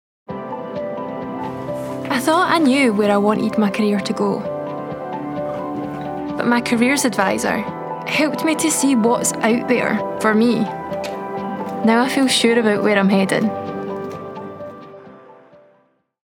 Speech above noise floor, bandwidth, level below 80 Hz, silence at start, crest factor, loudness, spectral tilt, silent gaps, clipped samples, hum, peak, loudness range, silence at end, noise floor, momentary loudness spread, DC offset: 43 dB; 18.5 kHz; -58 dBFS; 0.3 s; 18 dB; -19 LUFS; -4.5 dB/octave; none; under 0.1%; none; 0 dBFS; 4 LU; 1 s; -60 dBFS; 13 LU; under 0.1%